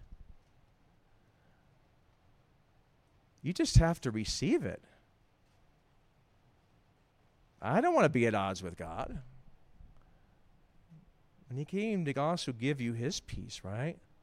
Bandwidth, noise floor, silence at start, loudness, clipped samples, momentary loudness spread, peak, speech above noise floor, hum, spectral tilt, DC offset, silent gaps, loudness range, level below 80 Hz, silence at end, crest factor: 15 kHz; -68 dBFS; 0 s; -33 LUFS; under 0.1%; 15 LU; -10 dBFS; 36 dB; none; -5.5 dB/octave; under 0.1%; none; 9 LU; -48 dBFS; 0.25 s; 26 dB